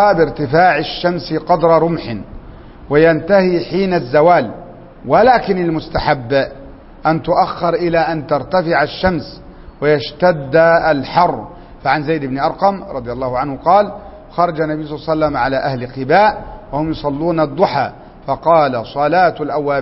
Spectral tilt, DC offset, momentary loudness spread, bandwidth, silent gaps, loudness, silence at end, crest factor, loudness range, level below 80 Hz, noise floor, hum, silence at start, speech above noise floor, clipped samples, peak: -10 dB/octave; under 0.1%; 12 LU; 5.8 kHz; none; -15 LUFS; 0 s; 14 dB; 3 LU; -38 dBFS; -35 dBFS; none; 0 s; 21 dB; under 0.1%; 0 dBFS